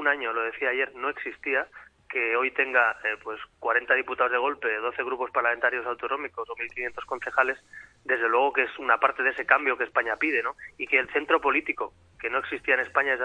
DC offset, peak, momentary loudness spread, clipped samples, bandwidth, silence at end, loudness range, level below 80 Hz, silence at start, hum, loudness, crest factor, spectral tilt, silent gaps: under 0.1%; -4 dBFS; 11 LU; under 0.1%; 9.8 kHz; 0 s; 3 LU; -64 dBFS; 0 s; none; -26 LUFS; 24 dB; -4 dB/octave; none